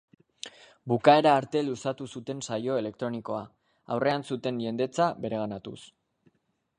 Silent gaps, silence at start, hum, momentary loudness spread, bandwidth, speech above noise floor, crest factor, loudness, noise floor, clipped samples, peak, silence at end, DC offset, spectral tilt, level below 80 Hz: none; 0.45 s; none; 22 LU; 10.5 kHz; 46 dB; 26 dB; -28 LUFS; -74 dBFS; under 0.1%; -4 dBFS; 0.9 s; under 0.1%; -5.5 dB/octave; -70 dBFS